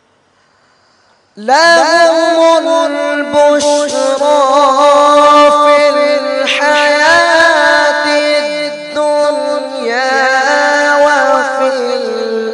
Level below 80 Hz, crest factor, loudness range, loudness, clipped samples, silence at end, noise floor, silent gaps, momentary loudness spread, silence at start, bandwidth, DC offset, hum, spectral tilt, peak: -58 dBFS; 10 dB; 4 LU; -9 LUFS; 0.2%; 0 s; -52 dBFS; none; 9 LU; 1.35 s; 11 kHz; under 0.1%; none; -1.5 dB/octave; 0 dBFS